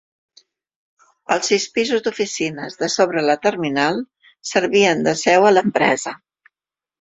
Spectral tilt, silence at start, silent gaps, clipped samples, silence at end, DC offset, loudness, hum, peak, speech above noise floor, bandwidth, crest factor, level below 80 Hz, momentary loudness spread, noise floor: -3.5 dB/octave; 1.3 s; none; under 0.1%; 0.85 s; under 0.1%; -18 LUFS; none; 0 dBFS; 72 dB; 8.2 kHz; 18 dB; -62 dBFS; 12 LU; -89 dBFS